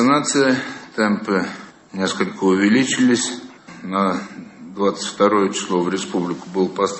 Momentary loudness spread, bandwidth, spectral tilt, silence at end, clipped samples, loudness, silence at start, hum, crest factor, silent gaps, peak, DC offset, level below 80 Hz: 18 LU; 8.6 kHz; -4 dB/octave; 0 s; under 0.1%; -19 LUFS; 0 s; none; 18 dB; none; -2 dBFS; under 0.1%; -62 dBFS